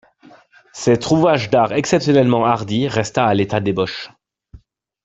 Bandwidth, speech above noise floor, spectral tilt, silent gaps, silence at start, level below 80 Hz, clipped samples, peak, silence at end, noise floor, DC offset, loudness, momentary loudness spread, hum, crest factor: 8.4 kHz; 32 dB; -6 dB/octave; none; 0.75 s; -52 dBFS; under 0.1%; -2 dBFS; 0.45 s; -48 dBFS; under 0.1%; -17 LUFS; 8 LU; none; 16 dB